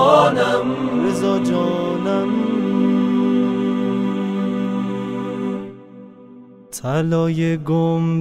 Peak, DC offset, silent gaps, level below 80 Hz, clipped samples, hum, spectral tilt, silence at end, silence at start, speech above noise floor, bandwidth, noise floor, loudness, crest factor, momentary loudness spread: 0 dBFS; under 0.1%; none; -58 dBFS; under 0.1%; none; -7 dB/octave; 0 s; 0 s; 24 dB; 14 kHz; -42 dBFS; -19 LUFS; 18 dB; 8 LU